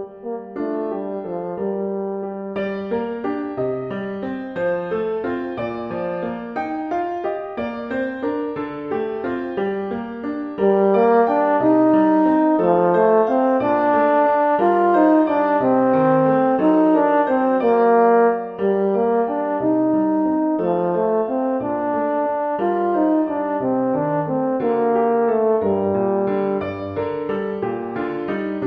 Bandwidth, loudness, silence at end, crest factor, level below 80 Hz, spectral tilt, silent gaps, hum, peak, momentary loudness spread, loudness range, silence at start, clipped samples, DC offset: 5.2 kHz; -19 LUFS; 0 s; 16 dB; -58 dBFS; -9.5 dB/octave; none; none; -4 dBFS; 11 LU; 9 LU; 0 s; under 0.1%; under 0.1%